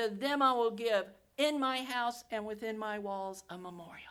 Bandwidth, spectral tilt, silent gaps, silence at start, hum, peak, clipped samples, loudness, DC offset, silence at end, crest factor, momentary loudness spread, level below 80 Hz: 17 kHz; -3.5 dB/octave; none; 0 s; none; -16 dBFS; under 0.1%; -34 LUFS; under 0.1%; 0 s; 18 dB; 17 LU; -74 dBFS